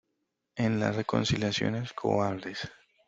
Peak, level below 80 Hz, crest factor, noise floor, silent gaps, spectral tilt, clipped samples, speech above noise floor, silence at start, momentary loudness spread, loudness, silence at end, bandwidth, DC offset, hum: -10 dBFS; -58 dBFS; 20 dB; -81 dBFS; none; -5.5 dB/octave; under 0.1%; 52 dB; 0.55 s; 11 LU; -30 LUFS; 0.35 s; 8 kHz; under 0.1%; none